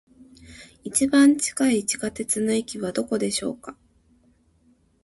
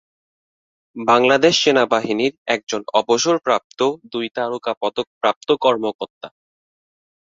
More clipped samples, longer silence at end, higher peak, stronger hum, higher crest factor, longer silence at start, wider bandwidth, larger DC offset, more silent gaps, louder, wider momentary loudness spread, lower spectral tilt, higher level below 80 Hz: neither; first, 1.3 s vs 0.95 s; second, -8 dBFS vs 0 dBFS; neither; about the same, 18 dB vs 20 dB; second, 0.5 s vs 0.95 s; first, 12 kHz vs 7.8 kHz; neither; second, none vs 2.38-2.46 s, 2.63-2.67 s, 3.64-3.70 s, 4.77-4.81 s, 5.07-5.21 s, 5.36-5.41 s, 5.95-5.99 s, 6.10-6.21 s; second, -22 LUFS vs -18 LUFS; first, 15 LU vs 12 LU; about the same, -3.5 dB/octave vs -3 dB/octave; first, -58 dBFS vs -64 dBFS